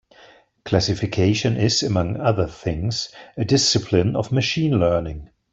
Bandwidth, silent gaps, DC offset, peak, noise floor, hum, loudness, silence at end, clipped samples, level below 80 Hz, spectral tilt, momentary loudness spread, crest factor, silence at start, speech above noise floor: 8.2 kHz; none; under 0.1%; -4 dBFS; -51 dBFS; none; -20 LUFS; 0.25 s; under 0.1%; -44 dBFS; -5 dB/octave; 10 LU; 18 dB; 0.65 s; 31 dB